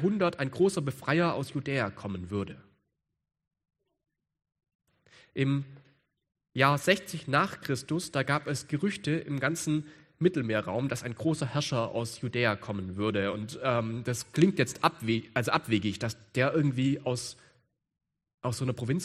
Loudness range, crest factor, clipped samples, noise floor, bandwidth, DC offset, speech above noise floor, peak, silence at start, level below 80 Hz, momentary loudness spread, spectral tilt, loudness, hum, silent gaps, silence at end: 10 LU; 24 dB; under 0.1%; -83 dBFS; 14 kHz; under 0.1%; 53 dB; -6 dBFS; 0 s; -66 dBFS; 8 LU; -5.5 dB/octave; -30 LUFS; none; 4.75-4.79 s, 18.34-18.38 s; 0 s